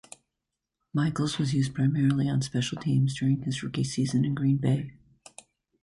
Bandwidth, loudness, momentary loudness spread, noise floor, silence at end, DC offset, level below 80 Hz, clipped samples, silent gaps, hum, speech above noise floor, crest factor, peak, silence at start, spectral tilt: 11.5 kHz; -27 LUFS; 5 LU; -85 dBFS; 0.9 s; under 0.1%; -58 dBFS; under 0.1%; none; none; 59 dB; 14 dB; -14 dBFS; 0.95 s; -6 dB/octave